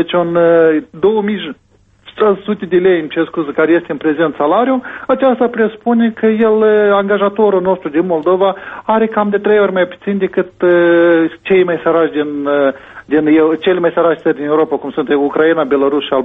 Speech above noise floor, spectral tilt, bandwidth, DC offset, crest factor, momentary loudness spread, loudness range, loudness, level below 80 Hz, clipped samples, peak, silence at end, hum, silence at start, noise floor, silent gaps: 30 dB; -9 dB/octave; 4 kHz; under 0.1%; 12 dB; 7 LU; 2 LU; -13 LUFS; -54 dBFS; under 0.1%; 0 dBFS; 0 s; none; 0 s; -42 dBFS; none